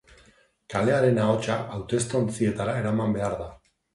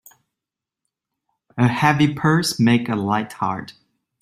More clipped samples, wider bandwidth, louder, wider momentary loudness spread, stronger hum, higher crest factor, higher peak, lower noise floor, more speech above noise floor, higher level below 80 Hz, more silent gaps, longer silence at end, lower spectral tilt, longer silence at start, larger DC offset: neither; second, 11.5 kHz vs 15.5 kHz; second, -25 LUFS vs -19 LUFS; about the same, 9 LU vs 9 LU; neither; about the same, 18 dB vs 20 dB; second, -8 dBFS vs -2 dBFS; second, -59 dBFS vs -87 dBFS; second, 35 dB vs 68 dB; first, -52 dBFS vs -58 dBFS; neither; about the same, 0.4 s vs 0.5 s; about the same, -6 dB/octave vs -5.5 dB/octave; second, 0.7 s vs 1.55 s; neither